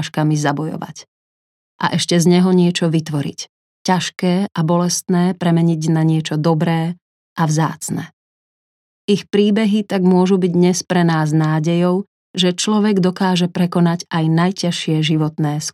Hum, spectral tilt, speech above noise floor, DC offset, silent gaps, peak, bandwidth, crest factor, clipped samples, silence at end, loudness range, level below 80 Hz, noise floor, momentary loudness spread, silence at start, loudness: none; -5.5 dB/octave; over 74 dB; under 0.1%; 1.08-1.79 s, 3.49-3.85 s, 7.02-7.36 s, 8.13-9.08 s, 12.08-12.34 s; -2 dBFS; 13.5 kHz; 14 dB; under 0.1%; 0.05 s; 4 LU; -64 dBFS; under -90 dBFS; 11 LU; 0 s; -17 LUFS